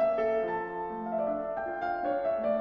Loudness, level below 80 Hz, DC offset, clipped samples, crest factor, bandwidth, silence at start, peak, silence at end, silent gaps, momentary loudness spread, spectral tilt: -31 LUFS; -62 dBFS; under 0.1%; under 0.1%; 12 dB; 5.8 kHz; 0 s; -18 dBFS; 0 s; none; 5 LU; -8 dB/octave